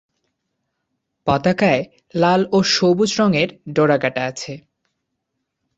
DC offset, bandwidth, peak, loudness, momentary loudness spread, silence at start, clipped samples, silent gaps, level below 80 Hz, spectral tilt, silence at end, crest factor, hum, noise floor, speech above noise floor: under 0.1%; 8 kHz; -2 dBFS; -18 LUFS; 12 LU; 1.25 s; under 0.1%; none; -54 dBFS; -5 dB/octave; 1.2 s; 18 dB; none; -76 dBFS; 59 dB